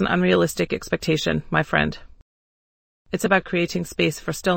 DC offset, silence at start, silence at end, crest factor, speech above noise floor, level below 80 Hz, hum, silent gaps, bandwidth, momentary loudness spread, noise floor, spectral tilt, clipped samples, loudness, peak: under 0.1%; 0 s; 0 s; 18 dB; over 68 dB; -46 dBFS; none; 2.22-3.05 s; 16.5 kHz; 7 LU; under -90 dBFS; -5 dB/octave; under 0.1%; -22 LUFS; -4 dBFS